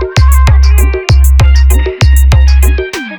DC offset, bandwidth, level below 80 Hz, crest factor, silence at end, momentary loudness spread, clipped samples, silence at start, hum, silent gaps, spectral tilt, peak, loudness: under 0.1%; 19 kHz; -6 dBFS; 6 dB; 0 s; 3 LU; 0.6%; 0 s; none; none; -5.5 dB/octave; 0 dBFS; -8 LUFS